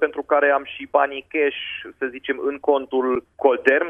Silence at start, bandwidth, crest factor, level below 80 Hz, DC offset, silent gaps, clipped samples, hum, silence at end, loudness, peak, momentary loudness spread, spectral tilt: 0 s; 3.7 kHz; 20 dB; -62 dBFS; under 0.1%; none; under 0.1%; none; 0 s; -21 LUFS; -2 dBFS; 10 LU; -5 dB/octave